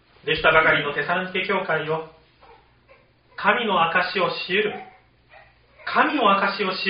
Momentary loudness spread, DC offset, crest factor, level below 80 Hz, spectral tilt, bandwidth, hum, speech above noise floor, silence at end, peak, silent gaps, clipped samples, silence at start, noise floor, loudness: 11 LU; under 0.1%; 20 dB; -54 dBFS; -1.5 dB/octave; 5.4 kHz; 60 Hz at -65 dBFS; 34 dB; 0 s; -4 dBFS; none; under 0.1%; 0.25 s; -56 dBFS; -21 LUFS